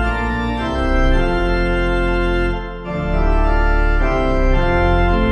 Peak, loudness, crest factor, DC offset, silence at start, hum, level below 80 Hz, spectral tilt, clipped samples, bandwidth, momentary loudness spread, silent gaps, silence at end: -2 dBFS; -18 LUFS; 12 dB; under 0.1%; 0 s; none; -18 dBFS; -7.5 dB/octave; under 0.1%; 6.6 kHz; 5 LU; none; 0 s